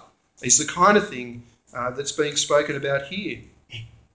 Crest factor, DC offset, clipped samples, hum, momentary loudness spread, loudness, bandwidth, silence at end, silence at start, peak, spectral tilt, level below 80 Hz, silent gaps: 20 dB; under 0.1%; under 0.1%; none; 21 LU; -21 LUFS; 8 kHz; 0.25 s; 0.4 s; -2 dBFS; -2.5 dB/octave; -56 dBFS; none